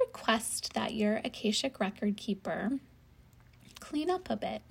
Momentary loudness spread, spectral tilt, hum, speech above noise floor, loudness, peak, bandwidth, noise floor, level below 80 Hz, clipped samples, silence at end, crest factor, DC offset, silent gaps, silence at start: 6 LU; -4 dB/octave; none; 26 dB; -33 LUFS; -12 dBFS; 16 kHz; -59 dBFS; -62 dBFS; under 0.1%; 0.1 s; 22 dB; under 0.1%; none; 0 s